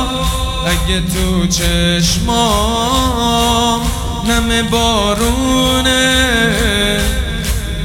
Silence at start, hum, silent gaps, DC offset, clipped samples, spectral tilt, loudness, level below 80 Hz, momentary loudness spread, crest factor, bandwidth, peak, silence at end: 0 s; none; none; under 0.1%; under 0.1%; -3.5 dB/octave; -13 LUFS; -20 dBFS; 6 LU; 14 dB; 17.5 kHz; 0 dBFS; 0 s